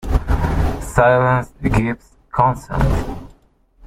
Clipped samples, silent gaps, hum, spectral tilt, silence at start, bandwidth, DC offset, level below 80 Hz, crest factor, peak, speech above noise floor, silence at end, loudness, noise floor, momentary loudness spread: under 0.1%; none; none; -7.5 dB/octave; 0 s; 15.5 kHz; under 0.1%; -24 dBFS; 16 dB; -2 dBFS; 38 dB; 0 s; -18 LUFS; -54 dBFS; 12 LU